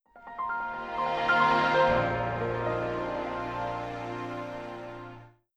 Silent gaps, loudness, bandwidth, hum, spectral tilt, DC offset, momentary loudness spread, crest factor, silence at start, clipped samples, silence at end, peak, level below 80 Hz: none; -29 LUFS; 9.8 kHz; none; -6 dB/octave; under 0.1%; 17 LU; 18 dB; 0.15 s; under 0.1%; 0.25 s; -12 dBFS; -52 dBFS